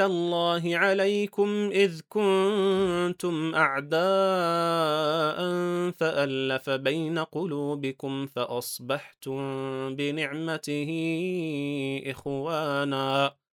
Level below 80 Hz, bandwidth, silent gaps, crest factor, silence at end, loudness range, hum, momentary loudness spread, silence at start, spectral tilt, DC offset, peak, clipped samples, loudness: -68 dBFS; 18.5 kHz; none; 20 dB; 0.25 s; 6 LU; none; 8 LU; 0 s; -5.5 dB/octave; under 0.1%; -8 dBFS; under 0.1%; -27 LUFS